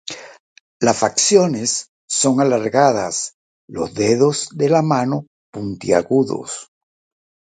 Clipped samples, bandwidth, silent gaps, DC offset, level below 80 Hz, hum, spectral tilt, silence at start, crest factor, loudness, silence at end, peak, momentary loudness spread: under 0.1%; 9.4 kHz; 0.40-0.80 s, 1.88-2.08 s, 3.34-3.68 s, 5.27-5.53 s; under 0.1%; -56 dBFS; none; -4 dB/octave; 0.05 s; 18 dB; -17 LUFS; 0.95 s; 0 dBFS; 15 LU